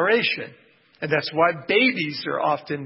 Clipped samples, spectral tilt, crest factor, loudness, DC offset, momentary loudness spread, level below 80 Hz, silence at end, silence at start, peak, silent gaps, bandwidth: under 0.1%; -8.5 dB/octave; 18 dB; -22 LUFS; under 0.1%; 10 LU; -70 dBFS; 0 s; 0 s; -6 dBFS; none; 5.8 kHz